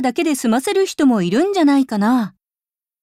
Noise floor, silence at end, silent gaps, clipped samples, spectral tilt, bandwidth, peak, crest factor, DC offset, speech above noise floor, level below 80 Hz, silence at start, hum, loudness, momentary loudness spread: under -90 dBFS; 0.75 s; none; under 0.1%; -5 dB/octave; 15.5 kHz; -6 dBFS; 12 dB; under 0.1%; over 74 dB; -64 dBFS; 0 s; none; -16 LUFS; 4 LU